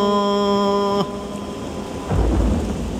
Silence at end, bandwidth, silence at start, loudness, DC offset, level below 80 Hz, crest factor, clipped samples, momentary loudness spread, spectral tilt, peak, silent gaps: 0 s; 14.5 kHz; 0 s; -21 LUFS; under 0.1%; -28 dBFS; 14 dB; under 0.1%; 11 LU; -6.5 dB/octave; -6 dBFS; none